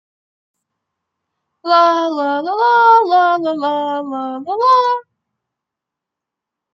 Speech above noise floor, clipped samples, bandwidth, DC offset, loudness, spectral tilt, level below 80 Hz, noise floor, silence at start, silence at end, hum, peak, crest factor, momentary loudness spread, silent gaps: 69 dB; under 0.1%; 7.4 kHz; under 0.1%; -14 LUFS; -4 dB/octave; -76 dBFS; -83 dBFS; 1.65 s; 1.75 s; none; -2 dBFS; 16 dB; 13 LU; none